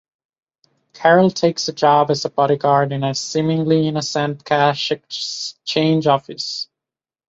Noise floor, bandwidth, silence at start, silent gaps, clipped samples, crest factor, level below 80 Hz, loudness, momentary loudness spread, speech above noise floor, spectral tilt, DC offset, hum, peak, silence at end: -88 dBFS; 8 kHz; 0.95 s; none; under 0.1%; 18 dB; -62 dBFS; -18 LUFS; 10 LU; 71 dB; -5 dB/octave; under 0.1%; none; 0 dBFS; 0.65 s